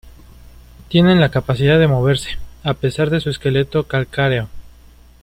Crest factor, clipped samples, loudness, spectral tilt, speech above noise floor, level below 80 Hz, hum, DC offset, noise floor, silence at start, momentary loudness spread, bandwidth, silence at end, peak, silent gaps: 16 dB; under 0.1%; -16 LUFS; -7 dB/octave; 29 dB; -38 dBFS; none; under 0.1%; -44 dBFS; 0.05 s; 10 LU; 15.5 kHz; 0.55 s; -2 dBFS; none